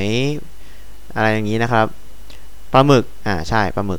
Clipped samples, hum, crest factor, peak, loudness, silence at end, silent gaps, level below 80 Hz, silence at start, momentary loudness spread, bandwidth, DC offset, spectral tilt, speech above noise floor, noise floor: under 0.1%; none; 18 dB; 0 dBFS; -17 LUFS; 0 s; none; -40 dBFS; 0 s; 10 LU; 19.5 kHz; 6%; -6 dB/octave; 23 dB; -40 dBFS